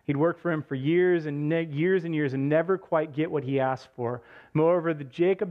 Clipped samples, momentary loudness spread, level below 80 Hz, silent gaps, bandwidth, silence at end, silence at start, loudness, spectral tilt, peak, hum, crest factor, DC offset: under 0.1%; 8 LU; -70 dBFS; none; 6.6 kHz; 0 s; 0.1 s; -27 LUFS; -9 dB/octave; -12 dBFS; none; 14 dB; under 0.1%